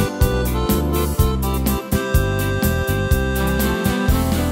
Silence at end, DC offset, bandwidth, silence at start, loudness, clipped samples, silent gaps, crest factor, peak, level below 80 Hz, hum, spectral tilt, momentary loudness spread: 0 s; under 0.1%; 16.5 kHz; 0 s; -19 LUFS; under 0.1%; none; 16 dB; -2 dBFS; -24 dBFS; none; -5.5 dB/octave; 2 LU